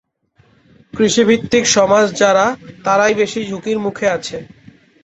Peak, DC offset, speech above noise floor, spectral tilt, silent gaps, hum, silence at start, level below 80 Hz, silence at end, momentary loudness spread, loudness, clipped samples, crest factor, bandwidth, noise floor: 0 dBFS; under 0.1%; 41 dB; -3.5 dB/octave; none; none; 0.95 s; -52 dBFS; 0.6 s; 11 LU; -15 LUFS; under 0.1%; 16 dB; 8.4 kHz; -55 dBFS